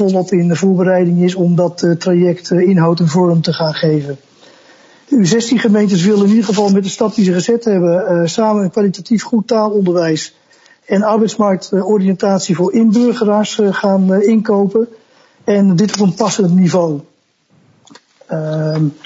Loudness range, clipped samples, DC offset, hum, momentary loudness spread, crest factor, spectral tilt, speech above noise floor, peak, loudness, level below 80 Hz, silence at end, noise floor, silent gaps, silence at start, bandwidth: 3 LU; under 0.1%; under 0.1%; none; 6 LU; 12 dB; -6.5 dB/octave; 43 dB; 0 dBFS; -13 LUFS; -62 dBFS; 0.15 s; -55 dBFS; none; 0 s; 8 kHz